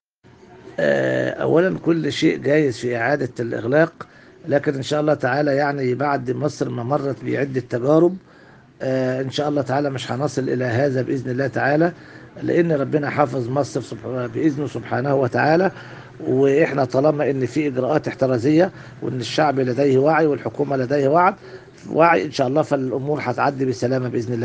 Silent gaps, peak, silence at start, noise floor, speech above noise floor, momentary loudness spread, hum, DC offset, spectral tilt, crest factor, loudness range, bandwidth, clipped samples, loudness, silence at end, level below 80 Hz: none; 0 dBFS; 0.5 s; -50 dBFS; 30 dB; 9 LU; none; under 0.1%; -7 dB/octave; 20 dB; 3 LU; 9.4 kHz; under 0.1%; -20 LUFS; 0 s; -60 dBFS